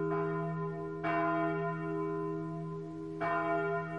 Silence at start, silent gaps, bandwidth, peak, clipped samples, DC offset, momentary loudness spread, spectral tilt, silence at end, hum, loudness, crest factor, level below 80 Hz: 0 s; none; 7 kHz; -20 dBFS; under 0.1%; under 0.1%; 8 LU; -9 dB/octave; 0 s; none; -35 LUFS; 14 dB; -68 dBFS